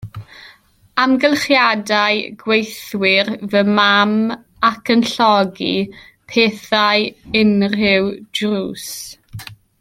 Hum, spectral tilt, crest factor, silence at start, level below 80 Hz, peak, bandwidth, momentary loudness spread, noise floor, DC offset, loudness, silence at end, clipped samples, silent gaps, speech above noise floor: none; -4.5 dB/octave; 16 dB; 0 s; -54 dBFS; 0 dBFS; 16 kHz; 14 LU; -49 dBFS; under 0.1%; -16 LUFS; 0.25 s; under 0.1%; none; 33 dB